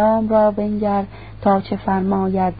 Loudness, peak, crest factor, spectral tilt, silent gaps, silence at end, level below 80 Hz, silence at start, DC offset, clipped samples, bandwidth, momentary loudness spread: -18 LUFS; -4 dBFS; 14 dB; -13 dB/octave; none; 0 s; -42 dBFS; 0 s; 0.5%; under 0.1%; 5 kHz; 7 LU